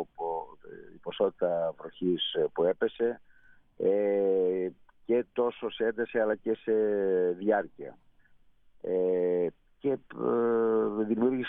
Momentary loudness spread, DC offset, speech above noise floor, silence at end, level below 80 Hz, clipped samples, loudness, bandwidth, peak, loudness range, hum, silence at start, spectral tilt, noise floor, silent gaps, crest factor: 15 LU; under 0.1%; 32 dB; 0 s; -68 dBFS; under 0.1%; -29 LUFS; 3.9 kHz; -14 dBFS; 2 LU; none; 0 s; -4 dB/octave; -60 dBFS; none; 16 dB